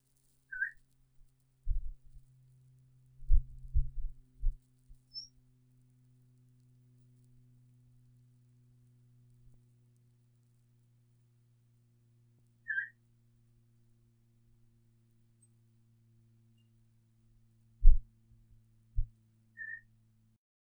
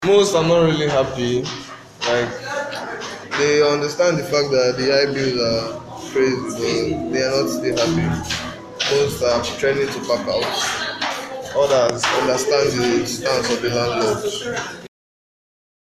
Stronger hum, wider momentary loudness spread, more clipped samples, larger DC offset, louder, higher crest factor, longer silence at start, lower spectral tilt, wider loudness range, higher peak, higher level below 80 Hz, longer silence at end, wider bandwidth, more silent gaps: neither; first, 26 LU vs 10 LU; neither; neither; second, -40 LUFS vs -19 LUFS; first, 28 dB vs 18 dB; first, 0.5 s vs 0 s; about the same, -4.5 dB/octave vs -4 dB/octave; first, 15 LU vs 2 LU; second, -8 dBFS vs -2 dBFS; first, -36 dBFS vs -50 dBFS; about the same, 0.9 s vs 1 s; second, 6 kHz vs 14 kHz; neither